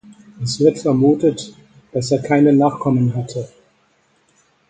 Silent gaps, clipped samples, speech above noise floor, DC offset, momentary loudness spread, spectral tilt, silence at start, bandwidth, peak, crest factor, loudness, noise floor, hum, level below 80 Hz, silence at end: none; under 0.1%; 44 dB; under 0.1%; 16 LU; -7 dB/octave; 0.1 s; 9.2 kHz; 0 dBFS; 18 dB; -17 LUFS; -60 dBFS; none; -56 dBFS; 1.25 s